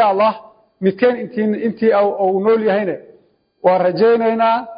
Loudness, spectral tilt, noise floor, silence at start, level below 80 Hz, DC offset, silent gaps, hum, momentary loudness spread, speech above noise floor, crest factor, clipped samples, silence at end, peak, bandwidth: -16 LUFS; -11.5 dB/octave; -54 dBFS; 0 s; -64 dBFS; under 0.1%; none; none; 7 LU; 38 dB; 14 dB; under 0.1%; 0 s; -2 dBFS; 5.2 kHz